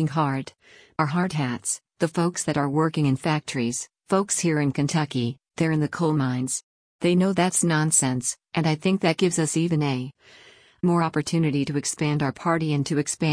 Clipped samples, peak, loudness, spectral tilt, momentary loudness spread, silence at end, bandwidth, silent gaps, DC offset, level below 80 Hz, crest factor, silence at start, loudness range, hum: under 0.1%; -8 dBFS; -24 LUFS; -5 dB/octave; 7 LU; 0 s; 10.5 kHz; 6.63-6.99 s; under 0.1%; -60 dBFS; 16 dB; 0 s; 3 LU; none